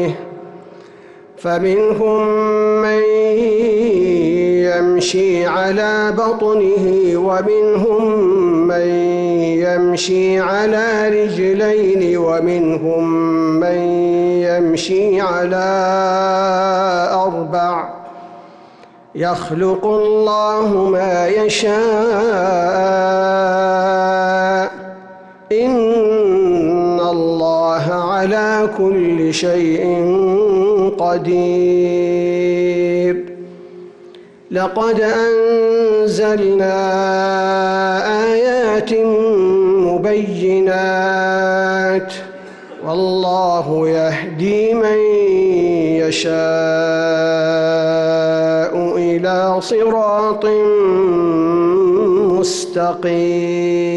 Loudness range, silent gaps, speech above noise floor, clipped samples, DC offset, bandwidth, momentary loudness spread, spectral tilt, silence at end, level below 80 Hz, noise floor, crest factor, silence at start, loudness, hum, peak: 3 LU; none; 28 dB; under 0.1%; under 0.1%; 11 kHz; 4 LU; -5.5 dB/octave; 0 s; -52 dBFS; -42 dBFS; 8 dB; 0 s; -15 LUFS; none; -8 dBFS